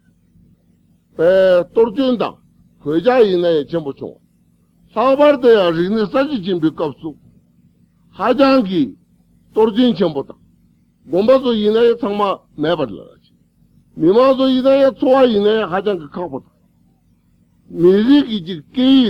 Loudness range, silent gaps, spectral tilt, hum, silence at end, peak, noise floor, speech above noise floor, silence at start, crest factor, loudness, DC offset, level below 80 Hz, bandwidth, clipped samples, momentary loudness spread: 3 LU; none; -7.5 dB/octave; none; 0 s; -2 dBFS; -56 dBFS; 42 dB; 1.2 s; 14 dB; -15 LUFS; under 0.1%; -54 dBFS; 6.6 kHz; under 0.1%; 15 LU